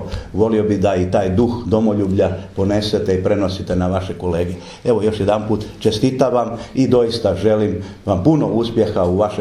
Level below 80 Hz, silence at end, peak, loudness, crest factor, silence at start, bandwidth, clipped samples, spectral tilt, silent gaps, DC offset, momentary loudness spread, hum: -40 dBFS; 0 s; 0 dBFS; -17 LUFS; 16 dB; 0 s; 12.5 kHz; under 0.1%; -7.5 dB/octave; none; under 0.1%; 6 LU; none